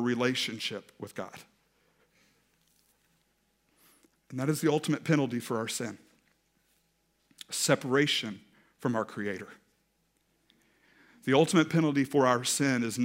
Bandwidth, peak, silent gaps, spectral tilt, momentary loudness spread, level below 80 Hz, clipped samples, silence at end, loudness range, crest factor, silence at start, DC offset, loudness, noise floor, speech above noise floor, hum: 16 kHz; -8 dBFS; none; -4.5 dB/octave; 17 LU; -78 dBFS; under 0.1%; 0 s; 12 LU; 24 dB; 0 s; under 0.1%; -29 LUFS; -74 dBFS; 45 dB; none